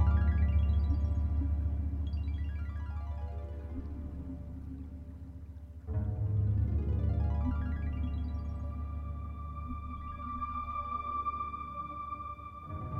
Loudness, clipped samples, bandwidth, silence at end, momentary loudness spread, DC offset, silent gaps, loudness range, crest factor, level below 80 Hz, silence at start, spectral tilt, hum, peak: -36 LUFS; under 0.1%; 3.8 kHz; 0 s; 13 LU; under 0.1%; none; 7 LU; 16 dB; -36 dBFS; 0 s; -10 dB/octave; none; -18 dBFS